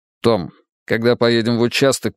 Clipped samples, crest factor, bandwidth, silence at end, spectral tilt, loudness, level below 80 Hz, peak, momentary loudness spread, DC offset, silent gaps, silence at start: under 0.1%; 16 dB; 15.5 kHz; 0.05 s; -5 dB/octave; -17 LUFS; -56 dBFS; 0 dBFS; 7 LU; under 0.1%; 0.72-0.86 s; 0.25 s